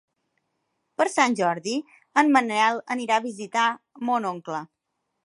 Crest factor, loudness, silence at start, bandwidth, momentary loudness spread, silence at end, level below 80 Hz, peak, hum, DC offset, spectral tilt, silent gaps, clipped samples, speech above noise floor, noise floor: 22 dB; -24 LUFS; 1 s; 11.5 kHz; 12 LU; 0.6 s; -80 dBFS; -4 dBFS; none; under 0.1%; -3.5 dB/octave; none; under 0.1%; 55 dB; -79 dBFS